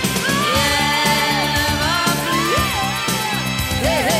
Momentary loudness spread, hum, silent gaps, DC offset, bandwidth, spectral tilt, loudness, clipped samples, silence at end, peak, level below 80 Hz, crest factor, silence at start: 4 LU; none; none; under 0.1%; 16 kHz; -3 dB/octave; -17 LUFS; under 0.1%; 0 s; -4 dBFS; -34 dBFS; 14 dB; 0 s